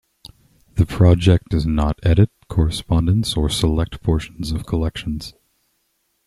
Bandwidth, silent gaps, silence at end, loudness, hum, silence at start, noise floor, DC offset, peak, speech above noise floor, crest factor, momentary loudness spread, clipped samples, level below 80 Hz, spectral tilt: 12.5 kHz; none; 0.95 s; -19 LUFS; none; 0.75 s; -68 dBFS; under 0.1%; -2 dBFS; 50 dB; 16 dB; 12 LU; under 0.1%; -30 dBFS; -6.5 dB/octave